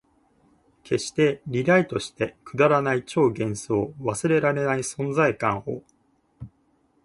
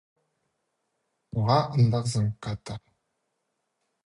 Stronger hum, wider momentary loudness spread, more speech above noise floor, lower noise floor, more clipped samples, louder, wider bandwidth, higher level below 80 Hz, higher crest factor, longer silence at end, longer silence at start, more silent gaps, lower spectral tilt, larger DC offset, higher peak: neither; second, 9 LU vs 15 LU; second, 42 dB vs 54 dB; second, -65 dBFS vs -79 dBFS; neither; about the same, -24 LUFS vs -26 LUFS; about the same, 11.5 kHz vs 11.5 kHz; about the same, -58 dBFS vs -56 dBFS; about the same, 18 dB vs 20 dB; second, 0.6 s vs 1.25 s; second, 0.85 s vs 1.35 s; neither; about the same, -5.5 dB/octave vs -6.5 dB/octave; neither; first, -6 dBFS vs -10 dBFS